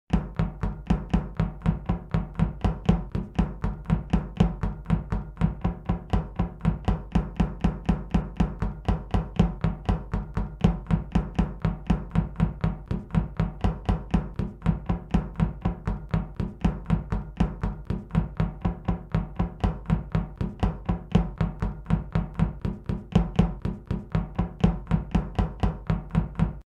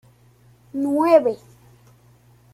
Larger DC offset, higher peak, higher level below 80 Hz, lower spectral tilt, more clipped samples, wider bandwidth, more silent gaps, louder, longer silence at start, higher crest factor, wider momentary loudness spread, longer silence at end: neither; second, -8 dBFS vs -2 dBFS; first, -32 dBFS vs -64 dBFS; first, -9 dB/octave vs -6.5 dB/octave; neither; second, 7.8 kHz vs 14.5 kHz; neither; second, -28 LUFS vs -19 LUFS; second, 0.1 s vs 0.75 s; about the same, 18 dB vs 20 dB; second, 6 LU vs 18 LU; second, 0.05 s vs 1.2 s